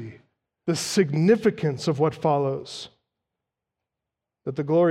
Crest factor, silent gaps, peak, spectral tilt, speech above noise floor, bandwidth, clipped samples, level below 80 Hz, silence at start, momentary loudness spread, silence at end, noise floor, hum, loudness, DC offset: 18 dB; none; -8 dBFS; -6 dB/octave; 64 dB; 15 kHz; under 0.1%; -66 dBFS; 0 s; 17 LU; 0 s; -86 dBFS; none; -24 LUFS; under 0.1%